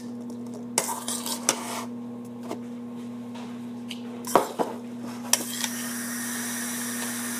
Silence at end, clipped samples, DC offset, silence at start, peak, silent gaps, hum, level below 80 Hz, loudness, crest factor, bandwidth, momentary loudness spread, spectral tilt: 0 s; under 0.1%; under 0.1%; 0 s; 0 dBFS; none; none; -74 dBFS; -30 LUFS; 30 dB; 15.5 kHz; 12 LU; -2 dB/octave